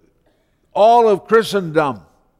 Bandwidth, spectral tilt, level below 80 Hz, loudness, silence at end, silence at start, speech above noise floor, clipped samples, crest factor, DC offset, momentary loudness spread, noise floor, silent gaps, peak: 14.5 kHz; -5.5 dB/octave; -56 dBFS; -15 LUFS; 0.4 s; 0.75 s; 46 dB; under 0.1%; 14 dB; under 0.1%; 13 LU; -60 dBFS; none; -2 dBFS